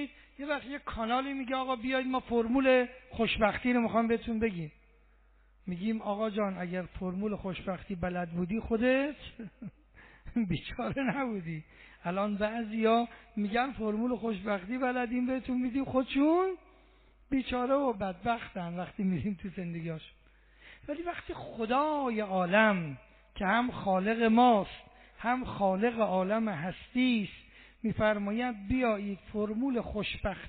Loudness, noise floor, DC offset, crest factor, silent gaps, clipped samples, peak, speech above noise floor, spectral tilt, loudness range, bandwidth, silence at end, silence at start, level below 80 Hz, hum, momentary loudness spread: -31 LUFS; -63 dBFS; under 0.1%; 20 dB; none; under 0.1%; -12 dBFS; 32 dB; -4.5 dB/octave; 7 LU; 4.6 kHz; 0 s; 0 s; -54 dBFS; none; 13 LU